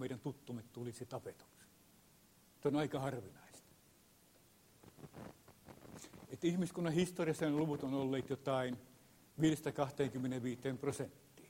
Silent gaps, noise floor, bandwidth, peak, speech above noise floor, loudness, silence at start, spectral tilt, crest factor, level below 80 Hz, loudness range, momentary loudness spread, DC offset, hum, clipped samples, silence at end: none; -68 dBFS; 16 kHz; -22 dBFS; 29 dB; -40 LUFS; 0 s; -6 dB/octave; 20 dB; -74 dBFS; 8 LU; 20 LU; under 0.1%; none; under 0.1%; 0 s